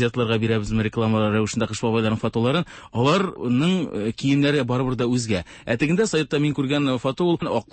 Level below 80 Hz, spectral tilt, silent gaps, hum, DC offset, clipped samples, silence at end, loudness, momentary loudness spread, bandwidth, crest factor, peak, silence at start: -48 dBFS; -6 dB/octave; none; none; under 0.1%; under 0.1%; 0.1 s; -22 LUFS; 4 LU; 8.8 kHz; 14 dB; -8 dBFS; 0 s